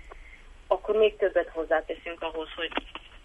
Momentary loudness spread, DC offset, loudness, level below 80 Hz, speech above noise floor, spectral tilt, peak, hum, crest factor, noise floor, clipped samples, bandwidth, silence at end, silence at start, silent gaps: 16 LU; under 0.1%; -28 LUFS; -50 dBFS; 20 dB; -5 dB/octave; -10 dBFS; none; 18 dB; -48 dBFS; under 0.1%; 8.2 kHz; 0.05 s; 0.05 s; none